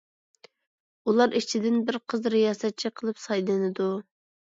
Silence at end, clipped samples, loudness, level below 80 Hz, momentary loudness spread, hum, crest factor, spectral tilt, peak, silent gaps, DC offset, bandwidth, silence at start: 0.55 s; under 0.1%; -26 LUFS; -78 dBFS; 8 LU; none; 18 dB; -5 dB/octave; -8 dBFS; none; under 0.1%; 7.8 kHz; 1.05 s